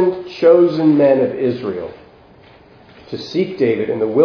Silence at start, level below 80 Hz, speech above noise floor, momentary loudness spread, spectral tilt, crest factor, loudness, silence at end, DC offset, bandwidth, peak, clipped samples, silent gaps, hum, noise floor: 0 s; -58 dBFS; 30 dB; 16 LU; -8 dB/octave; 16 dB; -15 LUFS; 0 s; under 0.1%; 5.4 kHz; 0 dBFS; under 0.1%; none; none; -45 dBFS